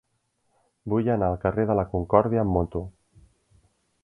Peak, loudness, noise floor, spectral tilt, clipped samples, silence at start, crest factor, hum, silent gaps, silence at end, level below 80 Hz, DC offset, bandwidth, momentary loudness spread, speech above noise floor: -2 dBFS; -24 LUFS; -73 dBFS; -11 dB/octave; under 0.1%; 0.85 s; 24 dB; none; none; 1.15 s; -44 dBFS; under 0.1%; 3.5 kHz; 12 LU; 49 dB